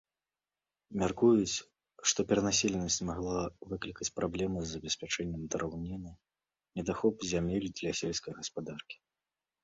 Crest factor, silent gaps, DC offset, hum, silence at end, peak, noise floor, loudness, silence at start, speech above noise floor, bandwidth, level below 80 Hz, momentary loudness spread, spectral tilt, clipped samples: 20 dB; none; under 0.1%; none; 0.7 s; -14 dBFS; under -90 dBFS; -33 LUFS; 0.9 s; over 57 dB; 8 kHz; -56 dBFS; 14 LU; -4 dB/octave; under 0.1%